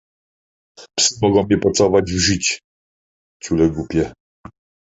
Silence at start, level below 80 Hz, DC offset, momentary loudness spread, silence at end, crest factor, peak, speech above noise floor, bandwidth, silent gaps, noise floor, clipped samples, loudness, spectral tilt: 0.8 s; -40 dBFS; under 0.1%; 12 LU; 0.85 s; 18 dB; -2 dBFS; over 73 dB; 8.2 kHz; 2.64-3.40 s; under -90 dBFS; under 0.1%; -17 LUFS; -4 dB/octave